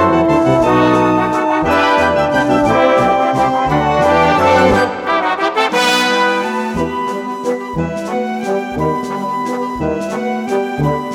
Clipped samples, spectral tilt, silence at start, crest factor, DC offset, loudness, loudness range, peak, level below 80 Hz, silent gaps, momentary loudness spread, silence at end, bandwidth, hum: under 0.1%; -5.5 dB/octave; 0 s; 14 dB; under 0.1%; -14 LUFS; 7 LU; 0 dBFS; -38 dBFS; none; 8 LU; 0 s; 17.5 kHz; none